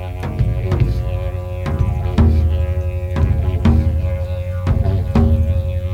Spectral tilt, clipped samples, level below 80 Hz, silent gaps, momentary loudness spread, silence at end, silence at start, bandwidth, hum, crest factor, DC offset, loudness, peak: -9 dB/octave; under 0.1%; -20 dBFS; none; 8 LU; 0 s; 0 s; 6.2 kHz; none; 14 dB; under 0.1%; -18 LUFS; -2 dBFS